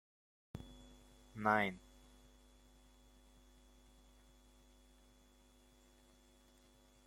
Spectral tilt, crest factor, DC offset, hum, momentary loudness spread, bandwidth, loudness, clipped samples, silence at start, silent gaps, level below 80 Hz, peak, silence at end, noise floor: -5.5 dB/octave; 30 dB; under 0.1%; none; 31 LU; 16 kHz; -39 LUFS; under 0.1%; 0.55 s; none; -66 dBFS; -18 dBFS; 5.3 s; -67 dBFS